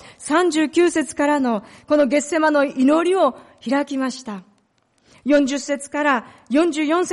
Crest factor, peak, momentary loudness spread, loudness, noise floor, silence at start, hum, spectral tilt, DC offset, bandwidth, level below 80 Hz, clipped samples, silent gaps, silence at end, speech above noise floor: 12 dB; -6 dBFS; 9 LU; -19 LUFS; -63 dBFS; 0.05 s; none; -3.5 dB/octave; under 0.1%; 11.5 kHz; -62 dBFS; under 0.1%; none; 0 s; 44 dB